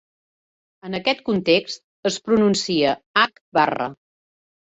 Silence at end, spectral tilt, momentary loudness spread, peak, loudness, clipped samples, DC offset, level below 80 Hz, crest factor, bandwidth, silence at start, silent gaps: 0.85 s; -4 dB/octave; 11 LU; -4 dBFS; -21 LUFS; under 0.1%; under 0.1%; -60 dBFS; 18 dB; 8.4 kHz; 0.85 s; 1.84-2.03 s, 3.06-3.14 s, 3.41-3.52 s